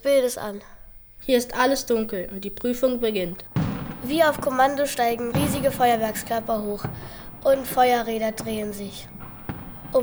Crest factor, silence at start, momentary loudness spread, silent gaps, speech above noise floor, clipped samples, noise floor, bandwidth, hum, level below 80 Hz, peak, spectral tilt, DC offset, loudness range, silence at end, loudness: 18 dB; 0 s; 15 LU; none; 20 dB; under 0.1%; -44 dBFS; over 20 kHz; none; -46 dBFS; -6 dBFS; -4.5 dB/octave; under 0.1%; 2 LU; 0 s; -24 LUFS